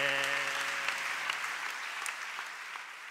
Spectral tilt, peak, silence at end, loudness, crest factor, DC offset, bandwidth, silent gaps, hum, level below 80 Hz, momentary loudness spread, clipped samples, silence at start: 0 dB/octave; -14 dBFS; 0 s; -34 LUFS; 22 dB; under 0.1%; 16 kHz; none; none; -88 dBFS; 10 LU; under 0.1%; 0 s